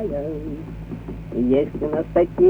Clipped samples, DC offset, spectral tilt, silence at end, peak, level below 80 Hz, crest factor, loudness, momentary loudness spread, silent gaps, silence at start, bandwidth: under 0.1%; under 0.1%; -10 dB/octave; 0 s; -6 dBFS; -38 dBFS; 14 dB; -24 LUFS; 13 LU; none; 0 s; 4.6 kHz